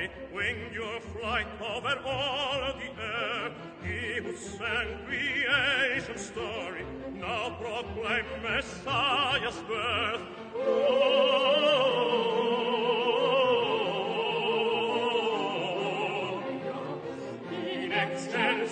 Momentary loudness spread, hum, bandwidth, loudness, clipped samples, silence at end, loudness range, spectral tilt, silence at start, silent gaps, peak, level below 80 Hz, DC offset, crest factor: 12 LU; none; 9.4 kHz; -29 LUFS; under 0.1%; 0 s; 6 LU; -4 dB/octave; 0 s; none; -12 dBFS; -54 dBFS; under 0.1%; 18 dB